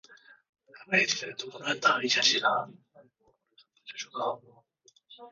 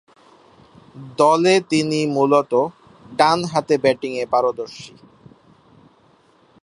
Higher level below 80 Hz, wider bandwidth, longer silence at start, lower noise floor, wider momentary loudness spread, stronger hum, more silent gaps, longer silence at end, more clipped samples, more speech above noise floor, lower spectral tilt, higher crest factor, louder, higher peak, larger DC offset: second, -80 dBFS vs -62 dBFS; second, 7.4 kHz vs 11.5 kHz; second, 0.1 s vs 0.95 s; first, -66 dBFS vs -55 dBFS; about the same, 18 LU vs 17 LU; neither; first, 0.49-0.53 s vs none; second, 0 s vs 1.75 s; neither; about the same, 36 dB vs 37 dB; second, 0.5 dB/octave vs -5 dB/octave; about the same, 22 dB vs 20 dB; second, -27 LUFS vs -18 LUFS; second, -10 dBFS vs 0 dBFS; neither